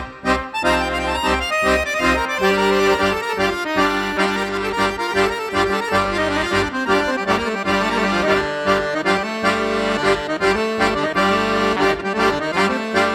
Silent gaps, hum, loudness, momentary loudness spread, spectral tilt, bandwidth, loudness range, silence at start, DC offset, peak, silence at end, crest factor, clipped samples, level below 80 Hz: none; none; -18 LUFS; 3 LU; -4 dB/octave; 16.5 kHz; 1 LU; 0 s; under 0.1%; -2 dBFS; 0 s; 16 dB; under 0.1%; -38 dBFS